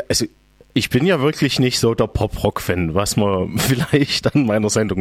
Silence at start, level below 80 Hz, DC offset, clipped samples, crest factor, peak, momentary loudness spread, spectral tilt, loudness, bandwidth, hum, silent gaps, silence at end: 0 s; -38 dBFS; under 0.1%; under 0.1%; 16 dB; -2 dBFS; 4 LU; -5 dB/octave; -18 LUFS; 17 kHz; none; none; 0 s